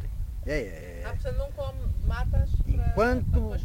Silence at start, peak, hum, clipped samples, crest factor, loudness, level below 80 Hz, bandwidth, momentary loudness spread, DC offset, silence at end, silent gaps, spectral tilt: 0 s; -12 dBFS; none; under 0.1%; 16 dB; -29 LUFS; -28 dBFS; 16 kHz; 12 LU; under 0.1%; 0 s; none; -7.5 dB/octave